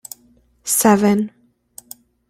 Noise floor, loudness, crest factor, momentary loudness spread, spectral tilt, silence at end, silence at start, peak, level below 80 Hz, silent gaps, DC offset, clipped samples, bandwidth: -55 dBFS; -16 LUFS; 18 dB; 24 LU; -4.5 dB/octave; 1 s; 0.65 s; -2 dBFS; -58 dBFS; none; under 0.1%; under 0.1%; 16.5 kHz